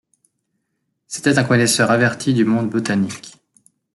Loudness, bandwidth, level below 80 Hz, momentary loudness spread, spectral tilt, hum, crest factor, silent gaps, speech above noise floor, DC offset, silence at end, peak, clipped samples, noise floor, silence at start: -17 LUFS; 12.5 kHz; -58 dBFS; 10 LU; -4.5 dB/octave; none; 16 dB; none; 56 dB; under 0.1%; 0.65 s; -2 dBFS; under 0.1%; -73 dBFS; 1.1 s